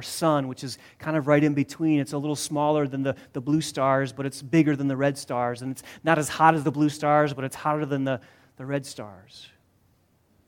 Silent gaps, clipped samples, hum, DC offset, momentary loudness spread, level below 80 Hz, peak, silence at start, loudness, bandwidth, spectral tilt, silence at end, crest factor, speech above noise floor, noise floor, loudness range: none; under 0.1%; none; under 0.1%; 13 LU; -66 dBFS; -2 dBFS; 0 s; -25 LUFS; 17 kHz; -6 dB/octave; 1 s; 22 dB; 39 dB; -64 dBFS; 4 LU